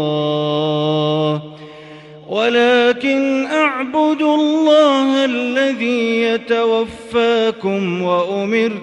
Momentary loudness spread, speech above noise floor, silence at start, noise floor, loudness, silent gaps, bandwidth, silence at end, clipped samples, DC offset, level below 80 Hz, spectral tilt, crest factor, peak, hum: 7 LU; 20 dB; 0 s; -37 dBFS; -16 LUFS; none; 10.5 kHz; 0 s; under 0.1%; under 0.1%; -58 dBFS; -6 dB/octave; 14 dB; -2 dBFS; none